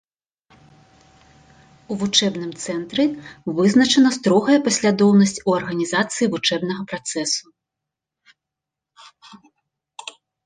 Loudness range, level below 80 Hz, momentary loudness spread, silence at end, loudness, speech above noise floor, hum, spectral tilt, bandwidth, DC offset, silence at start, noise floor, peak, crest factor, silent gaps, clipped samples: 12 LU; -62 dBFS; 14 LU; 0.35 s; -19 LUFS; 66 dB; none; -4 dB/octave; 10 kHz; under 0.1%; 1.9 s; -85 dBFS; -2 dBFS; 18 dB; none; under 0.1%